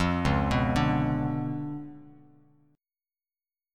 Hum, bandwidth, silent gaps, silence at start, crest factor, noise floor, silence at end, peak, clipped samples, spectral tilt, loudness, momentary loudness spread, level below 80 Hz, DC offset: none; 12 kHz; none; 0 s; 18 dB; under -90 dBFS; 1.65 s; -12 dBFS; under 0.1%; -7 dB/octave; -28 LUFS; 13 LU; -42 dBFS; under 0.1%